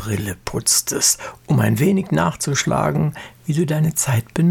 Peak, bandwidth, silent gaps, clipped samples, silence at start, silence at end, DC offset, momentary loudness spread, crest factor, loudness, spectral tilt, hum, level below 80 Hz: -2 dBFS; 18.5 kHz; none; under 0.1%; 0 s; 0 s; under 0.1%; 8 LU; 16 dB; -19 LUFS; -4.5 dB/octave; none; -46 dBFS